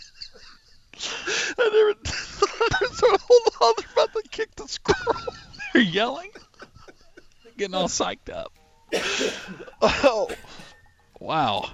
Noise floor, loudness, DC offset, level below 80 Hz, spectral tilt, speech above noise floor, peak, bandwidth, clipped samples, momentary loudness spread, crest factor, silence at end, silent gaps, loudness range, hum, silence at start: -53 dBFS; -23 LUFS; under 0.1%; -48 dBFS; -3 dB/octave; 29 dB; -6 dBFS; 12 kHz; under 0.1%; 18 LU; 18 dB; 0 s; none; 8 LU; none; 0 s